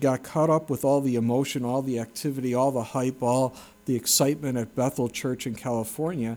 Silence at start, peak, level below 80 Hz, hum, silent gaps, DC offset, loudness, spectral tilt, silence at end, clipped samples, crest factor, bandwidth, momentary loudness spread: 0 s; -8 dBFS; -62 dBFS; none; none; under 0.1%; -26 LUFS; -5 dB/octave; 0 s; under 0.1%; 16 dB; over 20 kHz; 8 LU